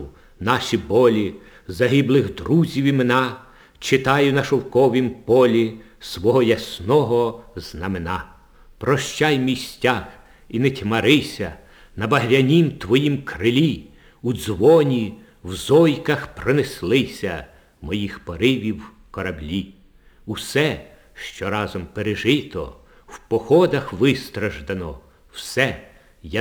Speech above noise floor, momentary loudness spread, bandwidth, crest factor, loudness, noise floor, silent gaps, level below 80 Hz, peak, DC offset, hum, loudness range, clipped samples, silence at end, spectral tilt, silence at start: 31 dB; 16 LU; over 20 kHz; 20 dB; -20 LUFS; -50 dBFS; none; -48 dBFS; 0 dBFS; under 0.1%; none; 6 LU; under 0.1%; 0 s; -6 dB/octave; 0 s